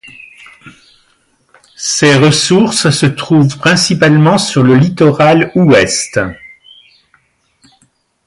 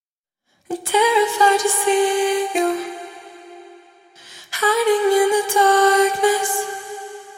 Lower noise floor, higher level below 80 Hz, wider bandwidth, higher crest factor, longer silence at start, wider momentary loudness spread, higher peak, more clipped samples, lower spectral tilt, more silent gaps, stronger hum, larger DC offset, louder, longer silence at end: second, -56 dBFS vs -75 dBFS; first, -46 dBFS vs -72 dBFS; second, 11.5 kHz vs 16.5 kHz; second, 12 dB vs 18 dB; about the same, 0.65 s vs 0.7 s; second, 7 LU vs 17 LU; about the same, 0 dBFS vs -2 dBFS; neither; first, -5 dB/octave vs 0 dB/octave; neither; neither; neither; first, -9 LUFS vs -17 LUFS; first, 1.8 s vs 0 s